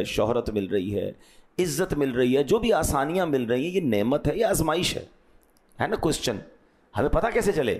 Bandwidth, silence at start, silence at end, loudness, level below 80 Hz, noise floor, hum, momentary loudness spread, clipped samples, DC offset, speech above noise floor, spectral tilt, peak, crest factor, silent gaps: 15.5 kHz; 0 s; 0 s; -25 LUFS; -42 dBFS; -58 dBFS; none; 8 LU; under 0.1%; under 0.1%; 34 dB; -5 dB/octave; -12 dBFS; 14 dB; none